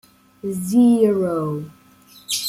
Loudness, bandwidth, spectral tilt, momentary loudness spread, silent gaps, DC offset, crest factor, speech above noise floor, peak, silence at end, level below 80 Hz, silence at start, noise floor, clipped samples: -19 LUFS; 15.5 kHz; -5.5 dB/octave; 17 LU; none; under 0.1%; 16 dB; 32 dB; -4 dBFS; 0 s; -62 dBFS; 0.45 s; -49 dBFS; under 0.1%